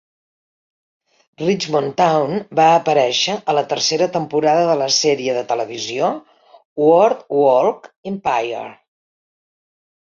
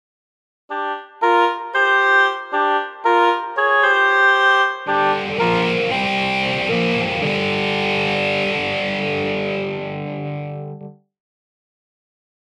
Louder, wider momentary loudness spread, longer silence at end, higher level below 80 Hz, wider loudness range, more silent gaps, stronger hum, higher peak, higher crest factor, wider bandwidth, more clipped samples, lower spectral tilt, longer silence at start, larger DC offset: about the same, -17 LUFS vs -18 LUFS; second, 10 LU vs 13 LU; second, 1.4 s vs 1.55 s; second, -64 dBFS vs -56 dBFS; second, 2 LU vs 8 LU; first, 6.65-6.76 s, 7.97-8.03 s vs none; neither; about the same, -2 dBFS vs -4 dBFS; about the same, 16 dB vs 16 dB; second, 7.6 kHz vs 11.5 kHz; neither; second, -3.5 dB/octave vs -5 dB/octave; first, 1.4 s vs 0.7 s; neither